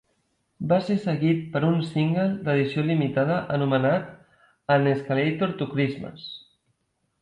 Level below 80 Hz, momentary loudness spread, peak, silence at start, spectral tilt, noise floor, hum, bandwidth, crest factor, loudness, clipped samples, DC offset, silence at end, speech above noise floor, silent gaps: -62 dBFS; 14 LU; -10 dBFS; 0.6 s; -8.5 dB/octave; -74 dBFS; none; 8.8 kHz; 16 dB; -24 LUFS; under 0.1%; under 0.1%; 0.85 s; 50 dB; none